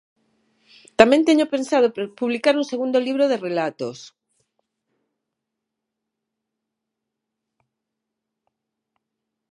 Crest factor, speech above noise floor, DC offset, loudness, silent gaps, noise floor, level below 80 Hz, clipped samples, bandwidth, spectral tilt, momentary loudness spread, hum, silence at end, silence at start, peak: 24 dB; 63 dB; under 0.1%; -19 LUFS; none; -82 dBFS; -66 dBFS; under 0.1%; 11.5 kHz; -4.5 dB/octave; 15 LU; none; 5.45 s; 1 s; 0 dBFS